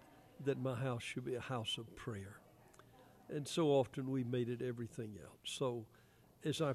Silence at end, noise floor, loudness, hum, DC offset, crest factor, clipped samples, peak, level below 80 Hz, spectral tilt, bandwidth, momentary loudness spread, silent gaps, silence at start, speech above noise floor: 0 s; -64 dBFS; -41 LUFS; none; under 0.1%; 20 dB; under 0.1%; -22 dBFS; -74 dBFS; -5.5 dB/octave; 14 kHz; 14 LU; none; 0 s; 24 dB